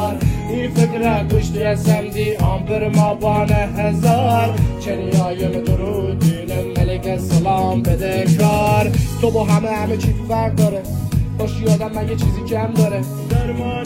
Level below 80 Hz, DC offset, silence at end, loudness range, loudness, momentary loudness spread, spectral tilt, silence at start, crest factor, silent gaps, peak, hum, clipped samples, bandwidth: -28 dBFS; 0.1%; 0 s; 2 LU; -18 LUFS; 6 LU; -7 dB/octave; 0 s; 14 dB; none; -2 dBFS; none; under 0.1%; 16.5 kHz